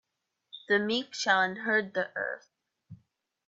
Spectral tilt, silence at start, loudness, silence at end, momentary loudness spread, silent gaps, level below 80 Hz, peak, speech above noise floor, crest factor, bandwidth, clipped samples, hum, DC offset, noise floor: -3 dB/octave; 0.55 s; -29 LUFS; 0.5 s; 17 LU; none; -80 dBFS; -12 dBFS; 46 dB; 20 dB; 8 kHz; under 0.1%; none; under 0.1%; -75 dBFS